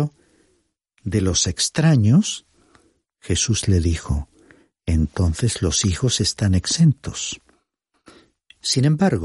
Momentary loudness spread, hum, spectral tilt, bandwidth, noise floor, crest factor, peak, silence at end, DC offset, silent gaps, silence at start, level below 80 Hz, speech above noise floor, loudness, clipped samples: 11 LU; none; -4.5 dB/octave; 11.5 kHz; -70 dBFS; 14 dB; -6 dBFS; 0 s; under 0.1%; none; 0 s; -34 dBFS; 51 dB; -20 LUFS; under 0.1%